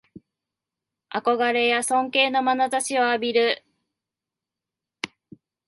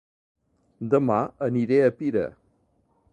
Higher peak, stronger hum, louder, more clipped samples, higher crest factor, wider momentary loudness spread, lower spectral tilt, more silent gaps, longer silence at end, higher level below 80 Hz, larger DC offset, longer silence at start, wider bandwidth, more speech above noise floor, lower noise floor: about the same, -6 dBFS vs -8 dBFS; neither; about the same, -22 LUFS vs -24 LUFS; neither; about the same, 20 dB vs 18 dB; first, 15 LU vs 9 LU; second, -1.5 dB/octave vs -9 dB/octave; neither; second, 0.6 s vs 0.8 s; second, -74 dBFS vs -62 dBFS; neither; first, 1.1 s vs 0.8 s; first, 12 kHz vs 9 kHz; first, 66 dB vs 44 dB; first, -88 dBFS vs -67 dBFS